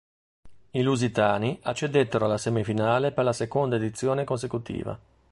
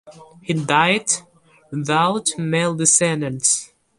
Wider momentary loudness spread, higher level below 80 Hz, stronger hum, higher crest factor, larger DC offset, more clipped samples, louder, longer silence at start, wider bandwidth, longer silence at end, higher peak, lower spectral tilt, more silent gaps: about the same, 9 LU vs 11 LU; about the same, -56 dBFS vs -60 dBFS; neither; about the same, 18 dB vs 20 dB; neither; neither; second, -26 LUFS vs -18 LUFS; first, 0.45 s vs 0.05 s; about the same, 11.5 kHz vs 11.5 kHz; about the same, 0.35 s vs 0.35 s; second, -8 dBFS vs 0 dBFS; first, -6 dB/octave vs -3 dB/octave; neither